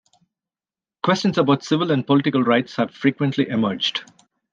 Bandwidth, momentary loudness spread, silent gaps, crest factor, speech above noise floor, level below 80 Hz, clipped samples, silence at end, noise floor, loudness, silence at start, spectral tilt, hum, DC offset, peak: 7.6 kHz; 5 LU; none; 18 dB; over 71 dB; -66 dBFS; under 0.1%; 0.5 s; under -90 dBFS; -20 LUFS; 1.05 s; -6 dB/octave; none; under 0.1%; -2 dBFS